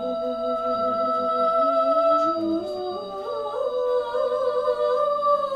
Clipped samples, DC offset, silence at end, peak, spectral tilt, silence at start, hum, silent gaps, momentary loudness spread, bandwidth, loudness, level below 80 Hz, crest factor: under 0.1%; under 0.1%; 0 s; -10 dBFS; -6 dB/octave; 0 s; none; none; 10 LU; 10.5 kHz; -23 LUFS; -60 dBFS; 12 dB